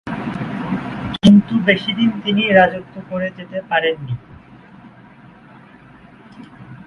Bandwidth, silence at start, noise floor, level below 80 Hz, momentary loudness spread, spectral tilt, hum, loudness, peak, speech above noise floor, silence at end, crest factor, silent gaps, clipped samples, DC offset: 11 kHz; 0.05 s; -43 dBFS; -48 dBFS; 17 LU; -7 dB/octave; none; -17 LUFS; 0 dBFS; 26 dB; 0.05 s; 18 dB; none; under 0.1%; under 0.1%